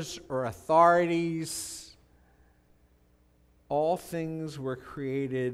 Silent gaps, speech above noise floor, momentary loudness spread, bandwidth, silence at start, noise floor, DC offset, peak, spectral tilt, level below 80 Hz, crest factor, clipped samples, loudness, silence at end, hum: none; 36 dB; 15 LU; 16 kHz; 0 s; -64 dBFS; under 0.1%; -10 dBFS; -5 dB/octave; -62 dBFS; 20 dB; under 0.1%; -29 LUFS; 0 s; 60 Hz at -65 dBFS